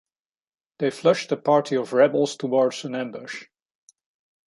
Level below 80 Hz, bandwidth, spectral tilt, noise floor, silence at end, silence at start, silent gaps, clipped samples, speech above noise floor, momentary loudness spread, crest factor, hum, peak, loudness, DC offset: -76 dBFS; 11.5 kHz; -5 dB/octave; under -90 dBFS; 1.05 s; 0.8 s; none; under 0.1%; over 68 dB; 13 LU; 18 dB; none; -6 dBFS; -22 LUFS; under 0.1%